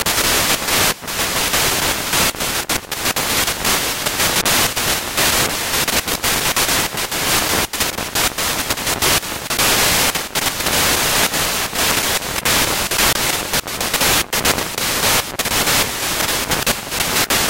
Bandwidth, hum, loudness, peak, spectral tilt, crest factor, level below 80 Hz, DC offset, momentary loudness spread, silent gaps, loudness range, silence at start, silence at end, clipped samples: 17 kHz; none; -16 LUFS; -2 dBFS; -1 dB/octave; 16 dB; -36 dBFS; under 0.1%; 5 LU; none; 1 LU; 0 s; 0 s; under 0.1%